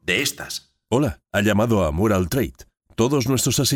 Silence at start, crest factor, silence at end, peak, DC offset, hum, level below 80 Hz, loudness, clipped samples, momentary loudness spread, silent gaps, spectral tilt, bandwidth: 0.05 s; 16 dB; 0 s; -6 dBFS; under 0.1%; none; -40 dBFS; -21 LUFS; under 0.1%; 12 LU; none; -4.5 dB/octave; over 20 kHz